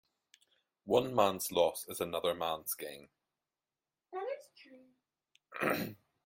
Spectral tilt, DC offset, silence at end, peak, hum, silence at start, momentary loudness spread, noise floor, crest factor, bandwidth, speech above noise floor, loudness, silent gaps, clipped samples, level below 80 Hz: -3.5 dB/octave; under 0.1%; 0.3 s; -12 dBFS; none; 0.85 s; 16 LU; under -90 dBFS; 24 dB; 16.5 kHz; over 56 dB; -35 LUFS; none; under 0.1%; -74 dBFS